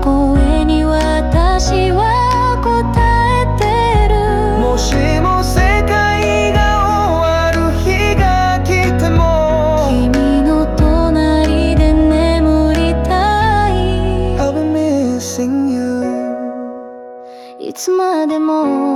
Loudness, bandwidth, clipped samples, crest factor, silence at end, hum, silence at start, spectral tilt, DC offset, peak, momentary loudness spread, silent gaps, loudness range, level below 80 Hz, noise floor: -13 LUFS; 14 kHz; under 0.1%; 10 dB; 0 s; none; 0 s; -6 dB/octave; under 0.1%; -2 dBFS; 5 LU; none; 5 LU; -18 dBFS; -33 dBFS